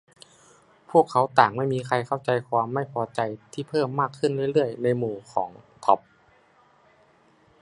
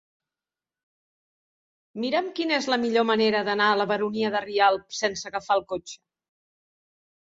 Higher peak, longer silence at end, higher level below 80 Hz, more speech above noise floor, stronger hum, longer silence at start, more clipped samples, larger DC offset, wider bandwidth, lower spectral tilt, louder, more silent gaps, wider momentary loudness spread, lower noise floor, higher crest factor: first, -2 dBFS vs -8 dBFS; first, 1.65 s vs 1.3 s; about the same, -68 dBFS vs -70 dBFS; second, 35 dB vs over 66 dB; neither; second, 0.9 s vs 1.95 s; neither; neither; first, 11 kHz vs 7.8 kHz; first, -6.5 dB/octave vs -3.5 dB/octave; about the same, -25 LUFS vs -24 LUFS; neither; about the same, 10 LU vs 11 LU; second, -59 dBFS vs under -90 dBFS; about the same, 24 dB vs 20 dB